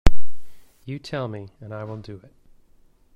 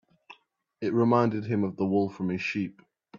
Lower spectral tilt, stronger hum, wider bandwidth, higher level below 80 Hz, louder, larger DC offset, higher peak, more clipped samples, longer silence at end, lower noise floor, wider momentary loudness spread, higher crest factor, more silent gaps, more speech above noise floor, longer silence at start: second, -6.5 dB/octave vs -8 dB/octave; neither; about the same, 7.8 kHz vs 7.2 kHz; first, -30 dBFS vs -70 dBFS; second, -33 LUFS vs -27 LUFS; neither; first, 0 dBFS vs -8 dBFS; first, 0.1% vs under 0.1%; about the same, 0 s vs 0 s; second, -55 dBFS vs -64 dBFS; first, 14 LU vs 10 LU; about the same, 18 dB vs 20 dB; neither; second, 27 dB vs 37 dB; second, 0.05 s vs 0.3 s